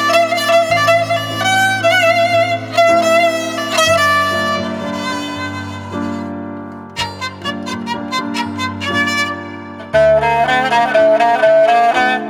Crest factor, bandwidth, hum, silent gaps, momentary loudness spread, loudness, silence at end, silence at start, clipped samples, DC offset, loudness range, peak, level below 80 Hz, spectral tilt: 14 dB; 19 kHz; none; none; 12 LU; -14 LUFS; 0 s; 0 s; under 0.1%; under 0.1%; 10 LU; 0 dBFS; -48 dBFS; -3.5 dB/octave